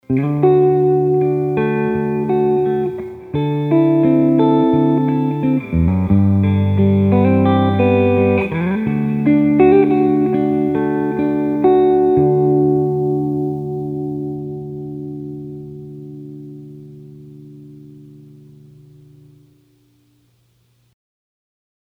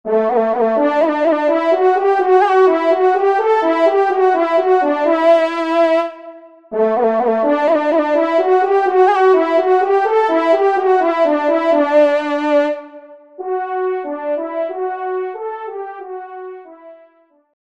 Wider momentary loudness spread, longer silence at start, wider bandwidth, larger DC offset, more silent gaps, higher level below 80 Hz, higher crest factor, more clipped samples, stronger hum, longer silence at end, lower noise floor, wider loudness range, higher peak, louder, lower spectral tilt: first, 16 LU vs 13 LU; about the same, 0.1 s vs 0.05 s; second, 4.2 kHz vs 8 kHz; second, under 0.1% vs 0.3%; neither; first, -42 dBFS vs -68 dBFS; about the same, 16 dB vs 14 dB; neither; neither; first, 3.85 s vs 0.8 s; first, -58 dBFS vs -52 dBFS; first, 16 LU vs 9 LU; about the same, 0 dBFS vs -2 dBFS; about the same, -15 LUFS vs -15 LUFS; first, -10.5 dB/octave vs -5.5 dB/octave